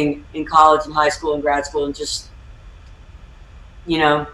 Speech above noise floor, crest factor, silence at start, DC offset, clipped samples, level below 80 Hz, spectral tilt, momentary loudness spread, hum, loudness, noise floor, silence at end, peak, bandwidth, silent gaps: 23 dB; 18 dB; 0 s; under 0.1%; under 0.1%; -42 dBFS; -4 dB/octave; 13 LU; none; -18 LUFS; -41 dBFS; 0 s; -2 dBFS; 12.5 kHz; none